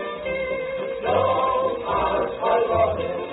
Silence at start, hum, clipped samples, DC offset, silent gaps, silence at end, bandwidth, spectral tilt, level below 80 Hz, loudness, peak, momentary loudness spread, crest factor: 0 s; none; under 0.1%; under 0.1%; none; 0 s; 4.1 kHz; -10 dB/octave; -46 dBFS; -23 LUFS; -8 dBFS; 7 LU; 14 dB